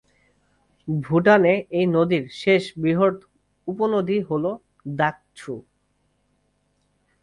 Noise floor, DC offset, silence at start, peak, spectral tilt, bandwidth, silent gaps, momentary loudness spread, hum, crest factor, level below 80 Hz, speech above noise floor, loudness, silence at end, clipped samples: -68 dBFS; under 0.1%; 0.85 s; -4 dBFS; -7.5 dB/octave; 11 kHz; none; 19 LU; 50 Hz at -50 dBFS; 20 dB; -60 dBFS; 48 dB; -21 LUFS; 1.65 s; under 0.1%